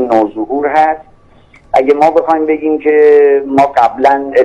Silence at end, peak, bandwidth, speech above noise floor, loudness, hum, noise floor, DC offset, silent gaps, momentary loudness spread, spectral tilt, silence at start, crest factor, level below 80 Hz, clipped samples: 0 s; 0 dBFS; 8 kHz; 33 dB; -10 LUFS; none; -43 dBFS; under 0.1%; none; 7 LU; -6.5 dB/octave; 0 s; 10 dB; -48 dBFS; under 0.1%